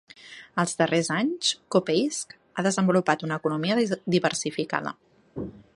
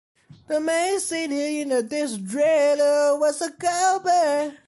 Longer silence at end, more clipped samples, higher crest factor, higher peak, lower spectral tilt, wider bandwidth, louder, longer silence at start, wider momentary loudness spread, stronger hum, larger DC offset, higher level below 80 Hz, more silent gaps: about the same, 0.2 s vs 0.1 s; neither; first, 22 dB vs 12 dB; first, -4 dBFS vs -10 dBFS; first, -4.5 dB/octave vs -3 dB/octave; about the same, 11.5 kHz vs 11.5 kHz; second, -25 LUFS vs -22 LUFS; second, 0.25 s vs 0.5 s; first, 15 LU vs 7 LU; neither; neither; first, -64 dBFS vs -72 dBFS; neither